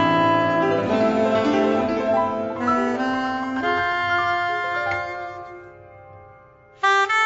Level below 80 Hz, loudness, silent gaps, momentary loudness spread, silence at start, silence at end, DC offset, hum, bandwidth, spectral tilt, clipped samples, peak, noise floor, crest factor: -56 dBFS; -21 LUFS; none; 9 LU; 0 s; 0 s; under 0.1%; none; 8 kHz; -5.5 dB/octave; under 0.1%; -6 dBFS; -49 dBFS; 14 dB